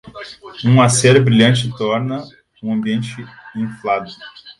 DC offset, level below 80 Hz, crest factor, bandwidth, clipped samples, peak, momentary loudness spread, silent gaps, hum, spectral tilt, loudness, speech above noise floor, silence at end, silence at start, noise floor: under 0.1%; -52 dBFS; 16 dB; 11.5 kHz; under 0.1%; 0 dBFS; 22 LU; none; none; -5 dB/octave; -15 LUFS; 19 dB; 0.1 s; 0.05 s; -35 dBFS